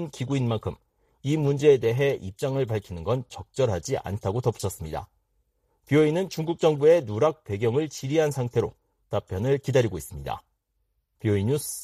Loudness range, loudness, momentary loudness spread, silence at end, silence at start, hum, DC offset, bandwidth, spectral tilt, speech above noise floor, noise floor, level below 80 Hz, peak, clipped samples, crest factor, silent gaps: 5 LU; -25 LUFS; 14 LU; 0 s; 0 s; none; under 0.1%; 15 kHz; -6.5 dB/octave; 50 dB; -74 dBFS; -52 dBFS; -8 dBFS; under 0.1%; 18 dB; none